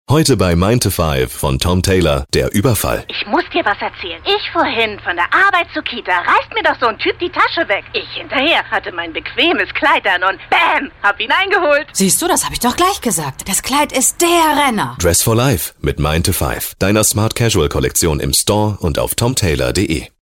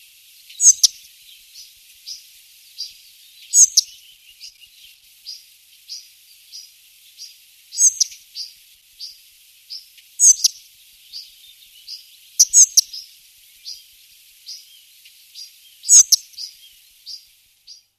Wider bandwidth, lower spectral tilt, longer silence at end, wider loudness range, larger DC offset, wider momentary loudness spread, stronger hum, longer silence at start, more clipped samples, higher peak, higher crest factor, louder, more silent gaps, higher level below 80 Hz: first, 17 kHz vs 14 kHz; first, -3.5 dB/octave vs 6.5 dB/octave; second, 0.15 s vs 0.85 s; second, 2 LU vs 7 LU; neither; second, 6 LU vs 28 LU; neither; second, 0.1 s vs 0.6 s; neither; about the same, -2 dBFS vs 0 dBFS; second, 12 dB vs 22 dB; about the same, -14 LUFS vs -12 LUFS; neither; first, -32 dBFS vs -72 dBFS